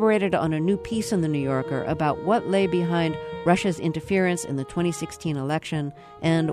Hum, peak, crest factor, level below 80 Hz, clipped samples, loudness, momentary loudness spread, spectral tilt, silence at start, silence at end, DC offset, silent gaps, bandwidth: none; -4 dBFS; 18 dB; -52 dBFS; under 0.1%; -25 LUFS; 7 LU; -6 dB/octave; 0 s; 0 s; under 0.1%; none; 13.5 kHz